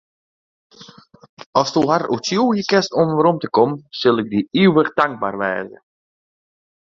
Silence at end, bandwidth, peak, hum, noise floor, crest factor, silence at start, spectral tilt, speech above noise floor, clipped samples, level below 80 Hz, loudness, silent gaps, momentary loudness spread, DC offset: 1.2 s; 7.6 kHz; -2 dBFS; none; -44 dBFS; 18 dB; 0.8 s; -5.5 dB/octave; 27 dB; under 0.1%; -60 dBFS; -18 LUFS; 1.29-1.37 s, 1.46-1.53 s; 7 LU; under 0.1%